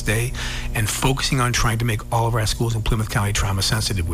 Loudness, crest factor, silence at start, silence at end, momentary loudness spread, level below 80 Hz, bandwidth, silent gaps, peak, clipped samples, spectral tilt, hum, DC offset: -21 LUFS; 14 dB; 0 s; 0 s; 4 LU; -28 dBFS; 16 kHz; none; -8 dBFS; under 0.1%; -4 dB/octave; none; under 0.1%